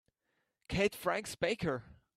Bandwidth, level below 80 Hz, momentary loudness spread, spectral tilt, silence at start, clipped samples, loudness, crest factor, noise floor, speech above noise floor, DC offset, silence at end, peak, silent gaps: 15.5 kHz; -58 dBFS; 7 LU; -4.5 dB/octave; 0.7 s; under 0.1%; -35 LUFS; 20 dB; -82 dBFS; 48 dB; under 0.1%; 0.25 s; -18 dBFS; none